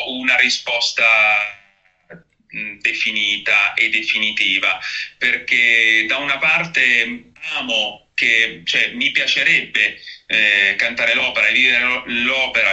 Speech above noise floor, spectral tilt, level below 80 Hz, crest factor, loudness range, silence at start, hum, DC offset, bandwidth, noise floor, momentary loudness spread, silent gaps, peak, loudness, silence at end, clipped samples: 39 dB; -1 dB/octave; -58 dBFS; 18 dB; 2 LU; 0 s; none; under 0.1%; 8.4 kHz; -56 dBFS; 9 LU; none; 0 dBFS; -15 LUFS; 0 s; under 0.1%